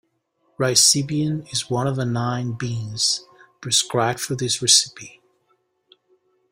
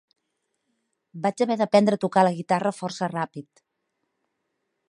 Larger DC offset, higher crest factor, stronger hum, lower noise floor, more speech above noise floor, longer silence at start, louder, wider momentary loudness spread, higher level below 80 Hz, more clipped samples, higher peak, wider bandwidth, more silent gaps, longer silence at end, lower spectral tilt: neither; about the same, 24 dB vs 22 dB; neither; second, -68 dBFS vs -78 dBFS; second, 47 dB vs 55 dB; second, 0.6 s vs 1.15 s; first, -19 LUFS vs -24 LUFS; about the same, 12 LU vs 11 LU; first, -60 dBFS vs -74 dBFS; neither; first, 0 dBFS vs -4 dBFS; first, 16 kHz vs 11 kHz; neither; about the same, 1.4 s vs 1.45 s; second, -2.5 dB/octave vs -6 dB/octave